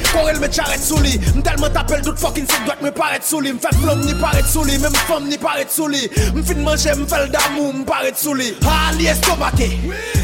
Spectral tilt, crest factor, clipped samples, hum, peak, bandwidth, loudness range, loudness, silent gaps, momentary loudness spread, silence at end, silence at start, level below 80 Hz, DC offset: -4 dB/octave; 16 dB; under 0.1%; none; 0 dBFS; 17 kHz; 1 LU; -17 LUFS; none; 4 LU; 0 s; 0 s; -22 dBFS; under 0.1%